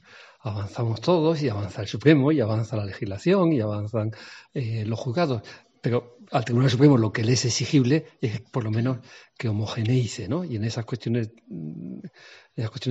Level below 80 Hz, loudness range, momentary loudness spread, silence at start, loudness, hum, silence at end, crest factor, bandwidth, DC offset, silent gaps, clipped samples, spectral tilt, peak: -62 dBFS; 6 LU; 15 LU; 0.15 s; -25 LUFS; none; 0 s; 20 dB; 8.2 kHz; under 0.1%; none; under 0.1%; -6.5 dB/octave; -4 dBFS